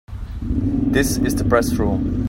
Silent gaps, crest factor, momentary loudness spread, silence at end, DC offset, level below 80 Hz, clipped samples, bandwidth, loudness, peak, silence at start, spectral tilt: none; 16 dB; 9 LU; 0 s; under 0.1%; -28 dBFS; under 0.1%; 16.5 kHz; -19 LUFS; -2 dBFS; 0.1 s; -6 dB/octave